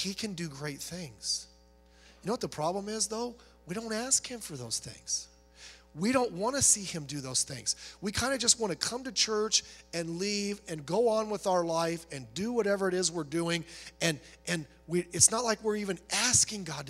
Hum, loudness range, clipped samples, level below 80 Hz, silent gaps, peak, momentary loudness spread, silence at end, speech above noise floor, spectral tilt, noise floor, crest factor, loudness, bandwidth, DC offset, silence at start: none; 5 LU; under 0.1%; -60 dBFS; none; -6 dBFS; 15 LU; 0 s; 28 dB; -2.5 dB/octave; -60 dBFS; 26 dB; -30 LUFS; 16 kHz; under 0.1%; 0 s